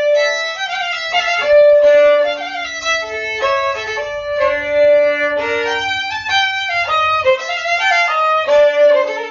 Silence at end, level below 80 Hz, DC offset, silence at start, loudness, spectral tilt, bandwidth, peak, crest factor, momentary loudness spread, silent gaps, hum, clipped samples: 0 s; -50 dBFS; under 0.1%; 0 s; -14 LUFS; 1.5 dB/octave; 7.4 kHz; -2 dBFS; 12 dB; 9 LU; none; none; under 0.1%